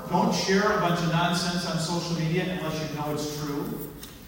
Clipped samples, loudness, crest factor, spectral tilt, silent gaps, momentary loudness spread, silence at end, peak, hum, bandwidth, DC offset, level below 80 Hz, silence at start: under 0.1%; -26 LUFS; 16 dB; -5 dB/octave; none; 9 LU; 0 s; -10 dBFS; none; 16.5 kHz; under 0.1%; -52 dBFS; 0 s